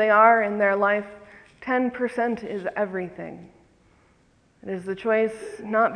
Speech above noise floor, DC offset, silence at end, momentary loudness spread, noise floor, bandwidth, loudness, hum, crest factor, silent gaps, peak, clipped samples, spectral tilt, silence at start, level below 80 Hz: 38 dB; under 0.1%; 0 s; 20 LU; -61 dBFS; 10 kHz; -23 LUFS; none; 22 dB; none; -2 dBFS; under 0.1%; -6.5 dB/octave; 0 s; -64 dBFS